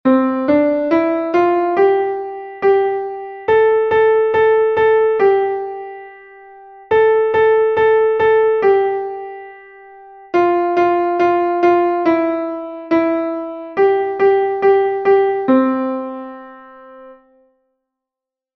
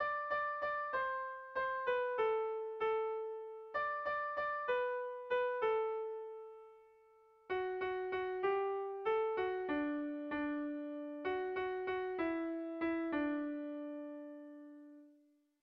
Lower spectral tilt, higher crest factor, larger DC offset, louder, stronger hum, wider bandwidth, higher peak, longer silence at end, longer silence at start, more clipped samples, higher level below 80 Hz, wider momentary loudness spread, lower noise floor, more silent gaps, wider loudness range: first, -7.5 dB/octave vs -2 dB/octave; about the same, 14 dB vs 14 dB; neither; first, -15 LUFS vs -39 LUFS; neither; about the same, 6 kHz vs 6 kHz; first, -2 dBFS vs -24 dBFS; first, 1.45 s vs 0.5 s; about the same, 0.05 s vs 0 s; neither; first, -56 dBFS vs -74 dBFS; about the same, 12 LU vs 11 LU; first, -86 dBFS vs -71 dBFS; neither; about the same, 2 LU vs 3 LU